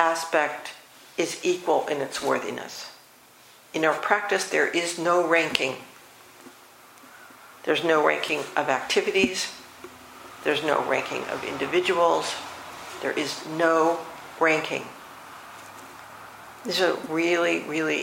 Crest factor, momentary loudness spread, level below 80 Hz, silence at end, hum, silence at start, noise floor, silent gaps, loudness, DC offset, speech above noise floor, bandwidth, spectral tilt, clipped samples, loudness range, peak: 26 dB; 21 LU; -68 dBFS; 0 s; none; 0 s; -53 dBFS; none; -25 LUFS; under 0.1%; 28 dB; 16.5 kHz; -3 dB/octave; under 0.1%; 3 LU; 0 dBFS